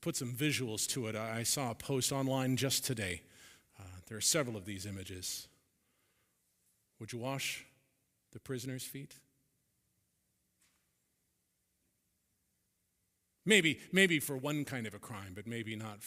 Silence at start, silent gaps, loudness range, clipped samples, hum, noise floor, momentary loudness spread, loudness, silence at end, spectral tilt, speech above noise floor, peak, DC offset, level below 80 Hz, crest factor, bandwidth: 0 s; none; 15 LU; under 0.1%; none; -81 dBFS; 18 LU; -35 LUFS; 0 s; -3.5 dB/octave; 45 dB; -10 dBFS; under 0.1%; -72 dBFS; 28 dB; 16 kHz